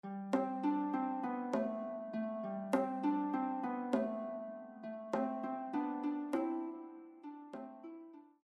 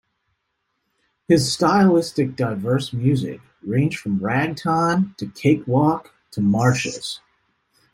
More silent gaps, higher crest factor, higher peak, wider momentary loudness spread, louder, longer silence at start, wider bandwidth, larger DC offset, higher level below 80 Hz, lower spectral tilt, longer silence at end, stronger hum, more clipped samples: neither; about the same, 18 dB vs 18 dB; second, -20 dBFS vs -4 dBFS; about the same, 14 LU vs 12 LU; second, -39 LUFS vs -20 LUFS; second, 0.05 s vs 1.3 s; second, 12 kHz vs 16 kHz; neither; second, -84 dBFS vs -56 dBFS; first, -7.5 dB/octave vs -6 dB/octave; second, 0.2 s vs 0.75 s; neither; neither